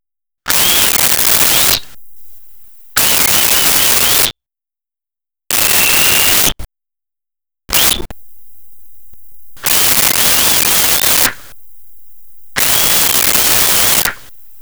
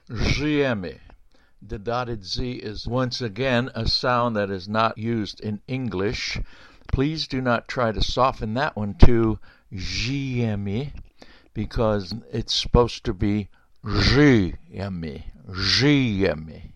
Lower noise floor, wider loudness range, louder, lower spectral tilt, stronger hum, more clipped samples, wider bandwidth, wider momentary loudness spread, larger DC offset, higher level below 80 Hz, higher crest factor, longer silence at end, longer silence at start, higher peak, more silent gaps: first, under -90 dBFS vs -53 dBFS; about the same, 4 LU vs 5 LU; first, -9 LUFS vs -23 LUFS; second, 0 dB/octave vs -6 dB/octave; neither; neither; first, over 20 kHz vs 8.6 kHz; second, 7 LU vs 15 LU; second, under 0.1% vs 0.1%; about the same, -36 dBFS vs -32 dBFS; second, 14 dB vs 22 dB; first, 0.45 s vs 0.05 s; first, 0.45 s vs 0.1 s; about the same, 0 dBFS vs 0 dBFS; neither